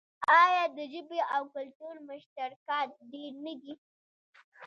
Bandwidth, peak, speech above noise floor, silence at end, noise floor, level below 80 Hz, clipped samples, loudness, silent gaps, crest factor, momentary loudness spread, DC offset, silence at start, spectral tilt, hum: 7.4 kHz; -12 dBFS; over 59 dB; 0 s; under -90 dBFS; -86 dBFS; under 0.1%; -29 LUFS; 1.75-1.80 s, 2.26-2.36 s, 2.56-2.66 s, 3.78-4.33 s, 4.44-4.52 s; 22 dB; 24 LU; under 0.1%; 0.2 s; -2.5 dB/octave; none